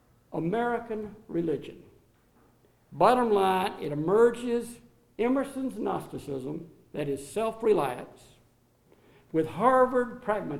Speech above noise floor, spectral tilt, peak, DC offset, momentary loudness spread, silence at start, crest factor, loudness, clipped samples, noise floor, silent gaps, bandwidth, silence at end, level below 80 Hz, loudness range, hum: 37 dB; -6.5 dB/octave; -8 dBFS; under 0.1%; 16 LU; 0.3 s; 20 dB; -28 LUFS; under 0.1%; -64 dBFS; none; 15 kHz; 0 s; -60 dBFS; 6 LU; none